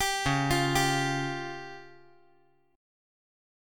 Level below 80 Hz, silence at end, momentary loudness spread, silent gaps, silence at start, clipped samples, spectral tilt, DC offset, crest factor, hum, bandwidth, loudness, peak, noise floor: -50 dBFS; 1.85 s; 17 LU; none; 0 s; under 0.1%; -4 dB/octave; under 0.1%; 18 dB; none; 17.5 kHz; -28 LUFS; -14 dBFS; -66 dBFS